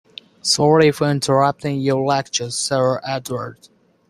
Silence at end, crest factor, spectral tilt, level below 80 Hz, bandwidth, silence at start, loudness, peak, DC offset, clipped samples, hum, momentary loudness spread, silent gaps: 0.55 s; 18 dB; -4.5 dB/octave; -56 dBFS; 15.5 kHz; 0.45 s; -18 LUFS; -2 dBFS; under 0.1%; under 0.1%; none; 11 LU; none